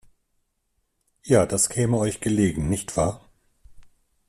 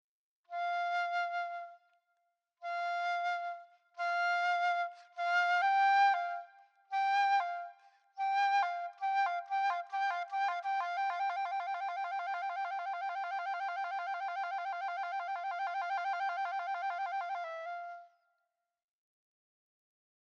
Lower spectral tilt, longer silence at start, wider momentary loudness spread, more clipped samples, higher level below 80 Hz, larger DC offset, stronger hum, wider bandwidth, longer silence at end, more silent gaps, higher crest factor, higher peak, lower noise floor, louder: first, -5.5 dB/octave vs 4.5 dB/octave; first, 1.25 s vs 0.5 s; second, 6 LU vs 12 LU; neither; first, -46 dBFS vs under -90 dBFS; neither; neither; first, 14 kHz vs 7.6 kHz; second, 0.45 s vs 2.15 s; neither; about the same, 20 dB vs 16 dB; first, -4 dBFS vs -20 dBFS; second, -73 dBFS vs -85 dBFS; first, -23 LUFS vs -34 LUFS